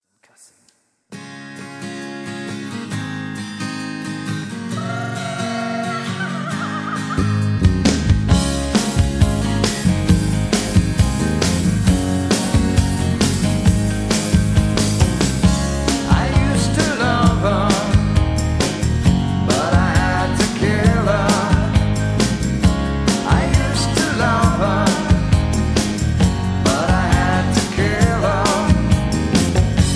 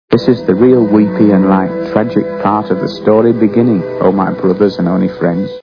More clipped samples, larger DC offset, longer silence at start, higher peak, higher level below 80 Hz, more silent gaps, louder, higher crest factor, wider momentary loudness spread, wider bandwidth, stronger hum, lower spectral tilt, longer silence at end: second, under 0.1% vs 0.3%; neither; first, 1.1 s vs 0.1 s; about the same, 0 dBFS vs 0 dBFS; first, -26 dBFS vs -46 dBFS; neither; second, -18 LUFS vs -11 LUFS; first, 16 dB vs 10 dB; first, 10 LU vs 6 LU; first, 11 kHz vs 5.4 kHz; neither; second, -5.5 dB/octave vs -9.5 dB/octave; about the same, 0 s vs 0 s